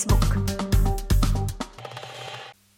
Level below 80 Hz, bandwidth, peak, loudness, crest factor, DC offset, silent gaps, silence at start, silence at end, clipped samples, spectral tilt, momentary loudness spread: -26 dBFS; 17 kHz; -8 dBFS; -25 LUFS; 14 dB; under 0.1%; none; 0 s; 0.25 s; under 0.1%; -5.5 dB/octave; 15 LU